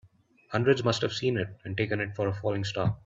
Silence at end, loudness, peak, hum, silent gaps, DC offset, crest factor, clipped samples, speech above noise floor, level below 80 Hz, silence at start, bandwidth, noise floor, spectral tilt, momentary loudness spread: 0.1 s; -29 LUFS; -10 dBFS; none; none; under 0.1%; 18 dB; under 0.1%; 32 dB; -60 dBFS; 0.5 s; 7.8 kHz; -60 dBFS; -6 dB/octave; 8 LU